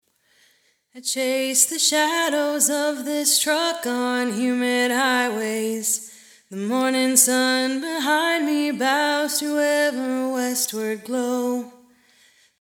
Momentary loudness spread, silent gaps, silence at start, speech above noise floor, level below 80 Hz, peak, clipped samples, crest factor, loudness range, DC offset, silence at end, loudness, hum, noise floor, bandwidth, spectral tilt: 9 LU; none; 0.95 s; 41 dB; -80 dBFS; 0 dBFS; under 0.1%; 22 dB; 3 LU; under 0.1%; 0.9 s; -21 LUFS; none; -62 dBFS; 19 kHz; -1 dB/octave